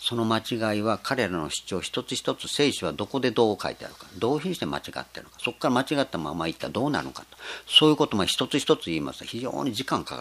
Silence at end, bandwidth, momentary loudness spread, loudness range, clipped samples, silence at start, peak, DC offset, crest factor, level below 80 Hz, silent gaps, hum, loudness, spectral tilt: 0 s; 15.5 kHz; 10 LU; 5 LU; under 0.1%; 0 s; -4 dBFS; under 0.1%; 22 dB; -58 dBFS; none; none; -26 LUFS; -4 dB/octave